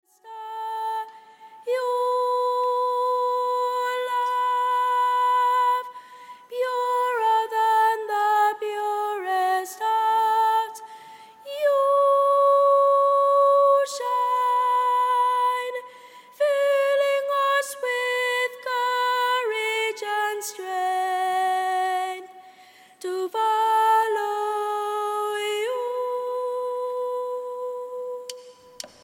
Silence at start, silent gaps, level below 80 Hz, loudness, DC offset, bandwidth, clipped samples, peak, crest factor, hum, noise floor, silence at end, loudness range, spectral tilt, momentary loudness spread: 0.25 s; none; -86 dBFS; -23 LUFS; under 0.1%; 17 kHz; under 0.1%; -10 dBFS; 12 dB; none; -51 dBFS; 0.15 s; 7 LU; 0 dB/octave; 13 LU